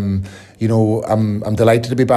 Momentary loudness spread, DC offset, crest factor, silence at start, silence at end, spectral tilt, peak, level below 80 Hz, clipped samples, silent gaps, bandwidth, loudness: 9 LU; under 0.1%; 14 dB; 0 s; 0 s; -7.5 dB/octave; -2 dBFS; -48 dBFS; under 0.1%; none; 13.5 kHz; -16 LUFS